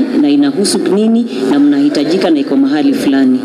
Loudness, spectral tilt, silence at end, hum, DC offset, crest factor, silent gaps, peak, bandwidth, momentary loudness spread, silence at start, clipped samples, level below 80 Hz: -11 LUFS; -5 dB/octave; 0 s; none; under 0.1%; 8 dB; none; -2 dBFS; 13 kHz; 2 LU; 0 s; under 0.1%; -58 dBFS